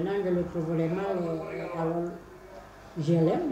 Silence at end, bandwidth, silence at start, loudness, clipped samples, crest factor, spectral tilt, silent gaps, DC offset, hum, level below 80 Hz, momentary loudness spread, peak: 0 s; 8.6 kHz; 0 s; -29 LUFS; under 0.1%; 16 dB; -8.5 dB/octave; none; under 0.1%; none; -56 dBFS; 22 LU; -14 dBFS